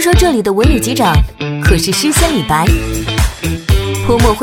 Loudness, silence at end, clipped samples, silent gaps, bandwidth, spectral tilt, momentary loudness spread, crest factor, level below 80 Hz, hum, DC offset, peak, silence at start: -12 LUFS; 0 s; under 0.1%; none; 19 kHz; -5 dB/octave; 5 LU; 12 dB; -18 dBFS; none; under 0.1%; 0 dBFS; 0 s